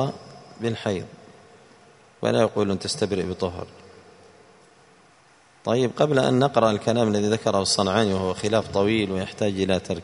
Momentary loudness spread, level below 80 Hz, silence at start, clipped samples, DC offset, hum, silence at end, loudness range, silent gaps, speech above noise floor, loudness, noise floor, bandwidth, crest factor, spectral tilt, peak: 10 LU; -58 dBFS; 0 s; under 0.1%; under 0.1%; none; 0 s; 7 LU; none; 33 dB; -23 LUFS; -55 dBFS; 11 kHz; 20 dB; -5 dB/octave; -4 dBFS